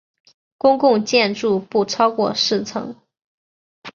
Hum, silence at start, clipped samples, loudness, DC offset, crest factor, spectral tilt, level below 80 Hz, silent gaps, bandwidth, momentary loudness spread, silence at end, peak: none; 0.65 s; under 0.1%; -18 LUFS; under 0.1%; 18 dB; -4 dB/octave; -64 dBFS; 3.24-3.82 s; 7.4 kHz; 10 LU; 0.05 s; -2 dBFS